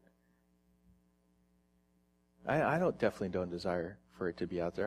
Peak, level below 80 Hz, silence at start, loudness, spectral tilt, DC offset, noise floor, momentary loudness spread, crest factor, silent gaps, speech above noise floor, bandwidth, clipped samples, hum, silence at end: -16 dBFS; -66 dBFS; 2.45 s; -36 LUFS; -7 dB/octave; under 0.1%; -73 dBFS; 9 LU; 22 dB; none; 39 dB; 13.5 kHz; under 0.1%; none; 0 s